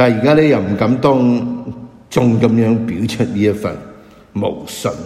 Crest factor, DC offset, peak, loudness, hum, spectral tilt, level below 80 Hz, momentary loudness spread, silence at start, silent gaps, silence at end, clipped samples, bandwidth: 14 dB; under 0.1%; 0 dBFS; -15 LUFS; none; -7 dB/octave; -46 dBFS; 14 LU; 0 s; none; 0 s; under 0.1%; 14.5 kHz